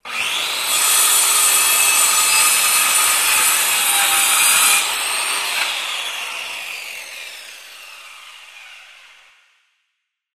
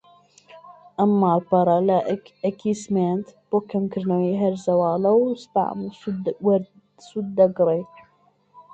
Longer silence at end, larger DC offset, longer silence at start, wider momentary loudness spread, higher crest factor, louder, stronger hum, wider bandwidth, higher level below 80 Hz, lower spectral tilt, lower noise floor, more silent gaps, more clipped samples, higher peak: first, 1.5 s vs 0.1 s; neither; second, 0.05 s vs 0.55 s; first, 18 LU vs 11 LU; about the same, 16 dB vs 18 dB; first, -13 LUFS vs -22 LUFS; neither; first, 15.5 kHz vs 8.6 kHz; about the same, -64 dBFS vs -64 dBFS; second, 3.5 dB/octave vs -8 dB/octave; first, -75 dBFS vs -61 dBFS; neither; neither; first, -2 dBFS vs -6 dBFS